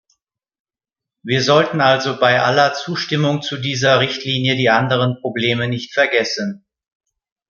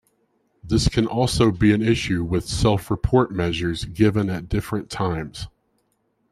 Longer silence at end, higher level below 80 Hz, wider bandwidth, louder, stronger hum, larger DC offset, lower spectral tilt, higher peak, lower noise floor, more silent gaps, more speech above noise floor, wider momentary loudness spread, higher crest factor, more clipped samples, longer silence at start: about the same, 0.9 s vs 0.85 s; second, -60 dBFS vs -36 dBFS; second, 7.2 kHz vs 14.5 kHz; first, -16 LUFS vs -21 LUFS; neither; neither; about the same, -5 dB/octave vs -6 dB/octave; about the same, -2 dBFS vs -4 dBFS; first, -88 dBFS vs -69 dBFS; neither; first, 71 dB vs 48 dB; about the same, 8 LU vs 9 LU; about the same, 16 dB vs 18 dB; neither; first, 1.25 s vs 0.65 s